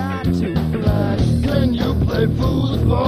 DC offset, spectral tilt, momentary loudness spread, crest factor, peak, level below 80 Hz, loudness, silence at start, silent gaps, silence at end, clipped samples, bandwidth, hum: under 0.1%; -8 dB/octave; 2 LU; 14 dB; -4 dBFS; -26 dBFS; -18 LUFS; 0 s; none; 0 s; under 0.1%; 15 kHz; none